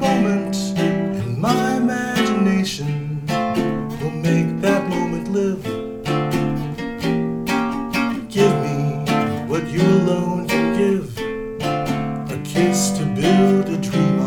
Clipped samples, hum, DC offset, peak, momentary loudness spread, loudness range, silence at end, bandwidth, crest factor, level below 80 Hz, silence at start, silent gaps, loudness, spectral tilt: under 0.1%; none; under 0.1%; -2 dBFS; 8 LU; 2 LU; 0 s; 18 kHz; 16 dB; -44 dBFS; 0 s; none; -20 LUFS; -6 dB/octave